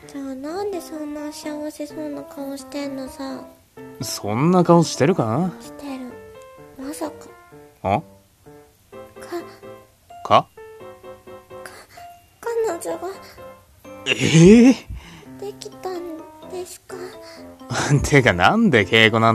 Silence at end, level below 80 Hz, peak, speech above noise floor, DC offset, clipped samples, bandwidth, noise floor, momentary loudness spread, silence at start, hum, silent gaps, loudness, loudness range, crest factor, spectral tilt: 0 s; -46 dBFS; 0 dBFS; 29 dB; under 0.1%; under 0.1%; 14 kHz; -48 dBFS; 25 LU; 0.05 s; none; none; -19 LUFS; 13 LU; 22 dB; -5.5 dB/octave